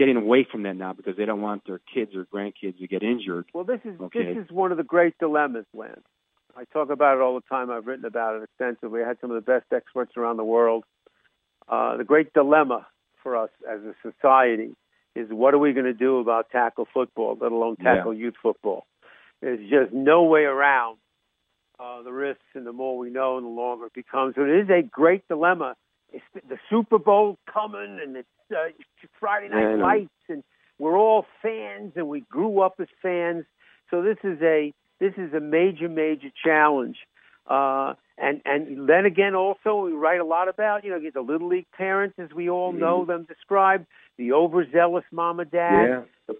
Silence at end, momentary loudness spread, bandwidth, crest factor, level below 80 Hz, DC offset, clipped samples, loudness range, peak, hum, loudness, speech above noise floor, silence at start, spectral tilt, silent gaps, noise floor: 0 s; 14 LU; 3.9 kHz; 20 dB; -70 dBFS; under 0.1%; under 0.1%; 5 LU; -4 dBFS; none; -23 LUFS; 52 dB; 0 s; -9 dB/octave; none; -75 dBFS